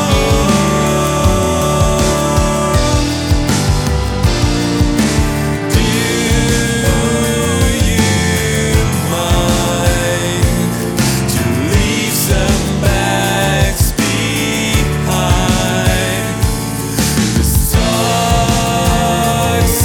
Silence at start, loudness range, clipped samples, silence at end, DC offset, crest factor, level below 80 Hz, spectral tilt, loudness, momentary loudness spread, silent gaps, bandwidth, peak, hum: 0 s; 1 LU; under 0.1%; 0 s; under 0.1%; 12 dB; -20 dBFS; -4.5 dB/octave; -13 LUFS; 2 LU; none; over 20 kHz; 0 dBFS; none